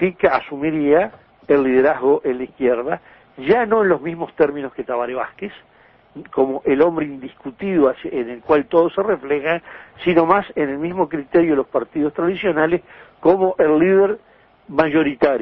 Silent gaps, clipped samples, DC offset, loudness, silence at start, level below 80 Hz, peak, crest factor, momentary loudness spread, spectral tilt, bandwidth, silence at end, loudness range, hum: none; under 0.1%; under 0.1%; -18 LUFS; 0 s; -52 dBFS; -2 dBFS; 18 dB; 11 LU; -9.5 dB/octave; 5.6 kHz; 0 s; 3 LU; none